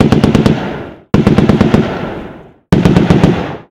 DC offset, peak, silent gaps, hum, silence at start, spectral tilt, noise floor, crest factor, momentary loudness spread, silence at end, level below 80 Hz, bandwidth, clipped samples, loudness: under 0.1%; 0 dBFS; none; none; 0 s; -7.5 dB/octave; -32 dBFS; 10 dB; 14 LU; 0.1 s; -28 dBFS; 12.5 kHz; 1%; -11 LUFS